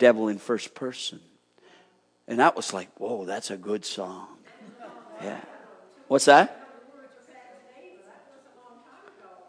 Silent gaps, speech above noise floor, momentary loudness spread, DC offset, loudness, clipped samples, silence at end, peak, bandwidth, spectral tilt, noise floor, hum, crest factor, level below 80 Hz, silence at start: none; 38 dB; 28 LU; under 0.1%; -25 LUFS; under 0.1%; 1.6 s; -2 dBFS; 10.5 kHz; -3.5 dB/octave; -62 dBFS; none; 24 dB; -86 dBFS; 0 s